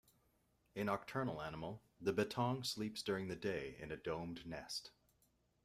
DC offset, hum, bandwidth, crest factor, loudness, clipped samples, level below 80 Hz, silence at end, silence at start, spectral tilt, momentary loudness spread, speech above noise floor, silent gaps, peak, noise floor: under 0.1%; none; 15.5 kHz; 20 dB; -43 LUFS; under 0.1%; -70 dBFS; 0.75 s; 0.75 s; -5 dB/octave; 10 LU; 36 dB; none; -24 dBFS; -78 dBFS